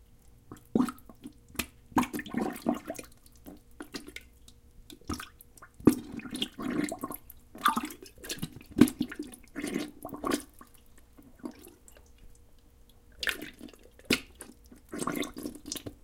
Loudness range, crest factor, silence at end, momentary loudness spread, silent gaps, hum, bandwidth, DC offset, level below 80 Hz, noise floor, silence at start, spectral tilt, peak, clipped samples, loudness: 10 LU; 32 dB; 0.1 s; 24 LU; none; none; 17 kHz; under 0.1%; -56 dBFS; -57 dBFS; 0.1 s; -4 dB/octave; -4 dBFS; under 0.1%; -33 LUFS